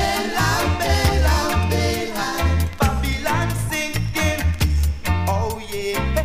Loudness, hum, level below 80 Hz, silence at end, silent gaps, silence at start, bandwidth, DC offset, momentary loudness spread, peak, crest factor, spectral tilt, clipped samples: -21 LUFS; none; -24 dBFS; 0 s; none; 0 s; 16 kHz; under 0.1%; 5 LU; -2 dBFS; 18 dB; -5 dB/octave; under 0.1%